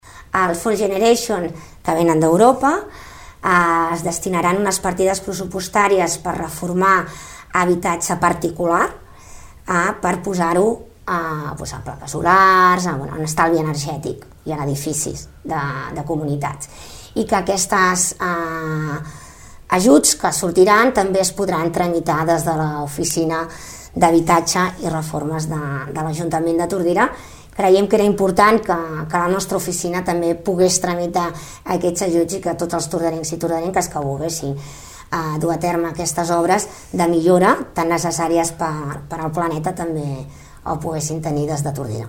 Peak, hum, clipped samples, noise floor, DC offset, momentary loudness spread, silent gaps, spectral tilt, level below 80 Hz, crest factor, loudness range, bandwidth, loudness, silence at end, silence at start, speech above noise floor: 0 dBFS; none; under 0.1%; -39 dBFS; under 0.1%; 13 LU; none; -4.5 dB/octave; -44 dBFS; 18 dB; 6 LU; 17 kHz; -18 LUFS; 0 s; 0.05 s; 21 dB